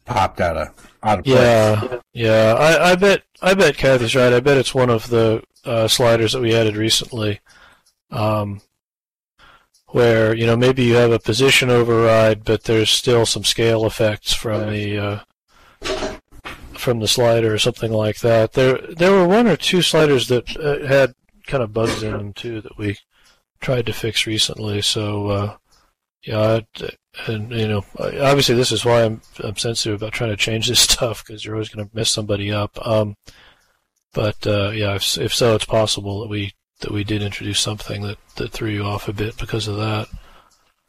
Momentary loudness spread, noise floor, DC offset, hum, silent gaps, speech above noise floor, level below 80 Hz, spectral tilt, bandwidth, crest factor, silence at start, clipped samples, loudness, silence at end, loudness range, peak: 14 LU; under -90 dBFS; under 0.1%; none; 8.84-8.90 s, 9.16-9.20 s; over 73 dB; -42 dBFS; -4.5 dB/octave; 15.5 kHz; 18 dB; 0.05 s; under 0.1%; -17 LUFS; 0.7 s; 8 LU; 0 dBFS